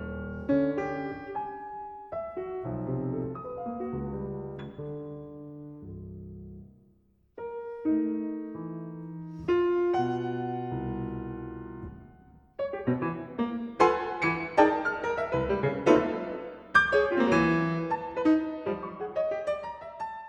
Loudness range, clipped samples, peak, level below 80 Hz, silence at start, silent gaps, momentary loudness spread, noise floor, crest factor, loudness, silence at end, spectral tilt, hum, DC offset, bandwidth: 12 LU; under 0.1%; -6 dBFS; -54 dBFS; 0 s; none; 18 LU; -65 dBFS; 24 dB; -29 LUFS; 0 s; -7 dB/octave; none; under 0.1%; 9.2 kHz